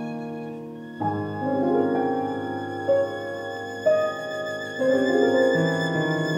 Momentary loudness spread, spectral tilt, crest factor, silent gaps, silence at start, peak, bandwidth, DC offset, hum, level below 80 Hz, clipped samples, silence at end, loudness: 12 LU; -6.5 dB/octave; 16 dB; none; 0 s; -8 dBFS; 16.5 kHz; under 0.1%; none; -70 dBFS; under 0.1%; 0 s; -24 LUFS